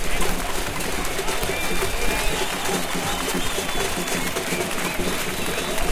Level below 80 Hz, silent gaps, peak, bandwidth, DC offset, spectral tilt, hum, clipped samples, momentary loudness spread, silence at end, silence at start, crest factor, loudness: -32 dBFS; none; -8 dBFS; 16.5 kHz; under 0.1%; -2.5 dB/octave; none; under 0.1%; 2 LU; 0 s; 0 s; 14 dB; -24 LUFS